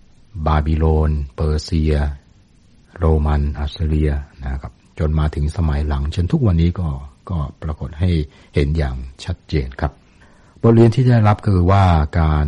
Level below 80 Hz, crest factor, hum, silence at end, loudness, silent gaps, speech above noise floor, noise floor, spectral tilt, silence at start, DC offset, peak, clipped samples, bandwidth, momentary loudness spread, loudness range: -24 dBFS; 14 dB; none; 0 s; -18 LUFS; none; 33 dB; -50 dBFS; -8.5 dB/octave; 0.35 s; under 0.1%; -2 dBFS; under 0.1%; 9.6 kHz; 14 LU; 6 LU